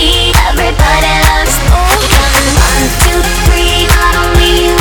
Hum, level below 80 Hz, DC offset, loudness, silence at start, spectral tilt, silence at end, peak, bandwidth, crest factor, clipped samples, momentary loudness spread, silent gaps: none; -12 dBFS; 0.3%; -8 LUFS; 0 s; -3.5 dB/octave; 0 s; 0 dBFS; over 20 kHz; 8 dB; 1%; 2 LU; none